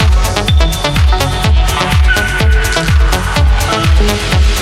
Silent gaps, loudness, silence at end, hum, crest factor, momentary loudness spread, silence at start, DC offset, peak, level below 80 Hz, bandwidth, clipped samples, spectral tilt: none; -12 LUFS; 0 s; none; 10 dB; 1 LU; 0 s; under 0.1%; 0 dBFS; -12 dBFS; 15.5 kHz; under 0.1%; -4.5 dB/octave